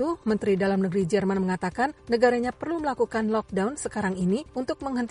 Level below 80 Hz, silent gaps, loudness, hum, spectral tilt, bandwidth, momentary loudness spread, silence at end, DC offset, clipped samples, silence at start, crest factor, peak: -54 dBFS; none; -26 LUFS; none; -6.5 dB/octave; 11 kHz; 6 LU; 0 s; under 0.1%; under 0.1%; 0 s; 16 dB; -8 dBFS